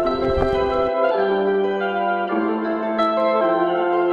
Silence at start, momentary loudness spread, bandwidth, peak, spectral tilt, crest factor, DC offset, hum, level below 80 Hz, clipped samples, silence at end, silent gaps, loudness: 0 s; 3 LU; 7 kHz; -4 dBFS; -7.5 dB/octave; 16 dB; under 0.1%; none; -38 dBFS; under 0.1%; 0 s; none; -20 LUFS